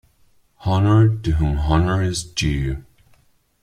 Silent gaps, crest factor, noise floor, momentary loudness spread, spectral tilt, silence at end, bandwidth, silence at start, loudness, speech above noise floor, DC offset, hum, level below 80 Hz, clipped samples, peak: none; 16 dB; -57 dBFS; 11 LU; -6 dB/octave; 0.8 s; 11.5 kHz; 0.6 s; -19 LUFS; 39 dB; under 0.1%; none; -30 dBFS; under 0.1%; -4 dBFS